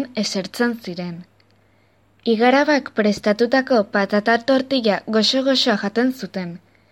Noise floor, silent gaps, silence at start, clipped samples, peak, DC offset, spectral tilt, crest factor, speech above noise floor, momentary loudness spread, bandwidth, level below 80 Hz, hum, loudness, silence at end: -58 dBFS; none; 0 s; under 0.1%; -4 dBFS; under 0.1%; -4.5 dB/octave; 16 dB; 39 dB; 13 LU; 16.5 kHz; -64 dBFS; none; -19 LUFS; 0.35 s